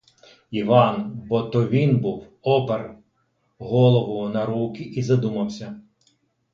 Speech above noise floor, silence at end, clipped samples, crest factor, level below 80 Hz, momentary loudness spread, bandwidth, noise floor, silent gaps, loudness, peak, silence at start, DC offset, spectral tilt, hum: 48 dB; 0.75 s; under 0.1%; 22 dB; -58 dBFS; 14 LU; 7.2 kHz; -69 dBFS; none; -22 LUFS; 0 dBFS; 0.5 s; under 0.1%; -8 dB/octave; none